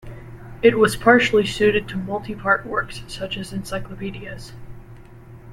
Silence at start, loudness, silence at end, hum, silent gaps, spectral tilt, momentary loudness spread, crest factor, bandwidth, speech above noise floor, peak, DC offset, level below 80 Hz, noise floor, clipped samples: 0.05 s; -20 LUFS; 0 s; none; none; -5 dB/octave; 22 LU; 20 dB; 14 kHz; 22 dB; -2 dBFS; under 0.1%; -42 dBFS; -42 dBFS; under 0.1%